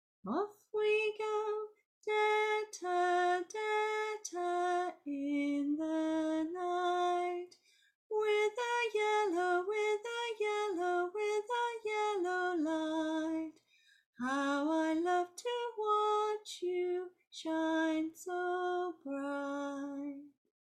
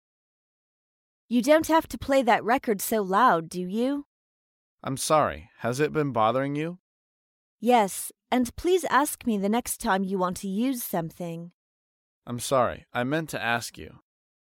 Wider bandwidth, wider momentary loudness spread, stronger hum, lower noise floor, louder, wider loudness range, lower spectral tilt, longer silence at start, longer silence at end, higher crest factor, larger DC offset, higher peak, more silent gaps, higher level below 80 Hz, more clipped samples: second, 13 kHz vs 17 kHz; second, 8 LU vs 13 LU; neither; second, -69 dBFS vs under -90 dBFS; second, -35 LUFS vs -26 LUFS; about the same, 3 LU vs 5 LU; second, -3 dB/octave vs -4.5 dB/octave; second, 0.25 s vs 1.3 s; second, 0.45 s vs 0.6 s; second, 14 dB vs 20 dB; neither; second, -22 dBFS vs -8 dBFS; second, 1.85-2.01 s, 7.95-8.10 s, 14.06-14.13 s vs 4.06-4.78 s, 6.80-7.58 s, 11.53-12.22 s; second, -84 dBFS vs -56 dBFS; neither